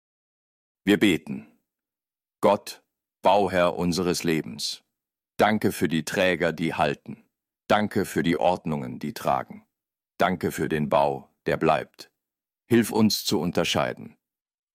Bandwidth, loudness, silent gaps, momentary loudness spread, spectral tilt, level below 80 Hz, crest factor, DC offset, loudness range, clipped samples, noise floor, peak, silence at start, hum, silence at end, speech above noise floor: 16 kHz; -24 LUFS; none; 11 LU; -5 dB/octave; -60 dBFS; 16 dB; under 0.1%; 2 LU; under 0.1%; under -90 dBFS; -8 dBFS; 0.85 s; none; 0.65 s; over 66 dB